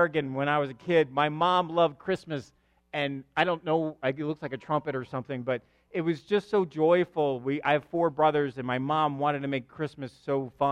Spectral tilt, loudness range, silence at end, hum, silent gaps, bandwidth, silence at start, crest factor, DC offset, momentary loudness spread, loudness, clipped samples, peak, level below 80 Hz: -7 dB/octave; 4 LU; 0 s; none; none; 10 kHz; 0 s; 20 dB; under 0.1%; 10 LU; -28 LUFS; under 0.1%; -8 dBFS; -68 dBFS